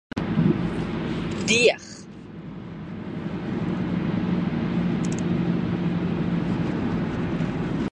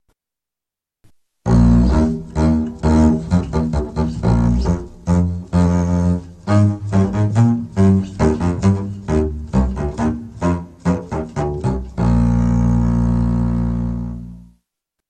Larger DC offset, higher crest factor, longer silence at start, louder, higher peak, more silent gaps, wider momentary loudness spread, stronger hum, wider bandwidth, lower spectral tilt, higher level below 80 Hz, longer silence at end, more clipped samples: neither; about the same, 20 dB vs 16 dB; second, 0.15 s vs 1.45 s; second, -25 LUFS vs -18 LUFS; about the same, -4 dBFS vs -2 dBFS; neither; first, 15 LU vs 8 LU; neither; about the same, 10 kHz vs 9.2 kHz; second, -5.5 dB/octave vs -8.5 dB/octave; second, -44 dBFS vs -24 dBFS; second, 0 s vs 0.7 s; neither